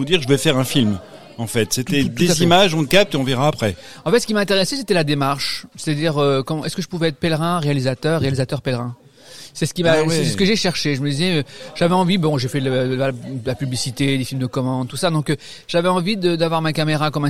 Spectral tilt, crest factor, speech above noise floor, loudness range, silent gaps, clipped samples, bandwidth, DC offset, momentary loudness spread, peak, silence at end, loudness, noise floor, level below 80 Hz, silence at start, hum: -5 dB/octave; 18 dB; 23 dB; 4 LU; none; under 0.1%; 16 kHz; 1%; 9 LU; -2 dBFS; 0 s; -19 LUFS; -41 dBFS; -48 dBFS; 0 s; none